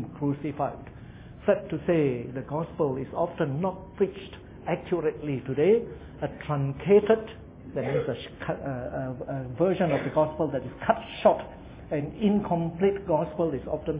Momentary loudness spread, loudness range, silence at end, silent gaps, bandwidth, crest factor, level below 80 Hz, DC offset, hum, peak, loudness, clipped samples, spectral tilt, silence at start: 12 LU; 3 LU; 0 s; none; 3.9 kHz; 22 dB; -50 dBFS; under 0.1%; none; -6 dBFS; -28 LUFS; under 0.1%; -11.5 dB/octave; 0 s